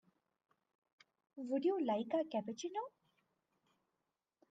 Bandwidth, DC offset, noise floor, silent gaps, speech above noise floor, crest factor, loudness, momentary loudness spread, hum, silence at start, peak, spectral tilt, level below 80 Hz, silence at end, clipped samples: 8.8 kHz; under 0.1%; -89 dBFS; none; 51 dB; 18 dB; -39 LUFS; 15 LU; none; 1.35 s; -26 dBFS; -5.5 dB/octave; under -90 dBFS; 1.6 s; under 0.1%